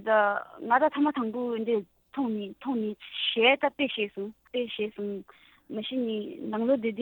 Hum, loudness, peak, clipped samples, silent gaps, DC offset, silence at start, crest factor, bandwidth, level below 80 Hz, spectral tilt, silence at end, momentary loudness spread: none; -28 LUFS; -6 dBFS; under 0.1%; none; under 0.1%; 0 s; 22 dB; over 20 kHz; -72 dBFS; -7 dB/octave; 0 s; 13 LU